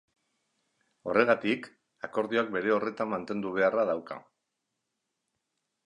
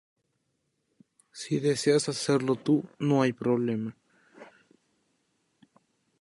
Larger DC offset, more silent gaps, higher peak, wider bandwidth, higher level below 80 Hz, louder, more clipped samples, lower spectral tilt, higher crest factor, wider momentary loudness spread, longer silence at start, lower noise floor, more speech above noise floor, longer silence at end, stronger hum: neither; neither; about the same, -8 dBFS vs -10 dBFS; second, 10 kHz vs 11.5 kHz; about the same, -74 dBFS vs -74 dBFS; about the same, -29 LUFS vs -27 LUFS; neither; about the same, -6.5 dB/octave vs -5.5 dB/octave; about the same, 24 dB vs 20 dB; first, 17 LU vs 10 LU; second, 1.05 s vs 1.35 s; first, -83 dBFS vs -77 dBFS; first, 55 dB vs 51 dB; about the same, 1.65 s vs 1.75 s; neither